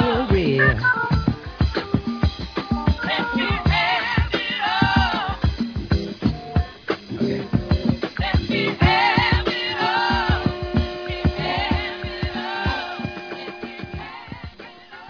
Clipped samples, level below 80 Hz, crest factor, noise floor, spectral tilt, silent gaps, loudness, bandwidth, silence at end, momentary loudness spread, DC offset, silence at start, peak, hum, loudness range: under 0.1%; -30 dBFS; 18 dB; -41 dBFS; -7 dB/octave; none; -21 LUFS; 5.4 kHz; 0 s; 15 LU; under 0.1%; 0 s; -4 dBFS; none; 6 LU